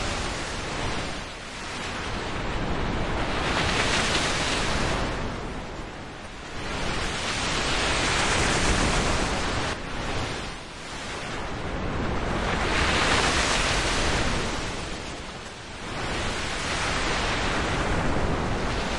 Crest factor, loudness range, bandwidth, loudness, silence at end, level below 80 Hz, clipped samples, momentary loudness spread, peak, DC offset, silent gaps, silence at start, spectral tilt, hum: 18 dB; 5 LU; 11.5 kHz; -26 LUFS; 0 s; -34 dBFS; under 0.1%; 13 LU; -8 dBFS; under 0.1%; none; 0 s; -3.5 dB/octave; none